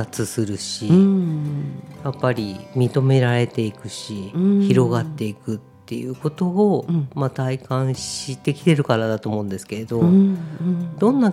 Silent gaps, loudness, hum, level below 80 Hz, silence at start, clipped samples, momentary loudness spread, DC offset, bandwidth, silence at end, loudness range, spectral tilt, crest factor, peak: none; -21 LUFS; none; -58 dBFS; 0 s; under 0.1%; 13 LU; under 0.1%; 14.5 kHz; 0 s; 3 LU; -7 dB/octave; 18 dB; -2 dBFS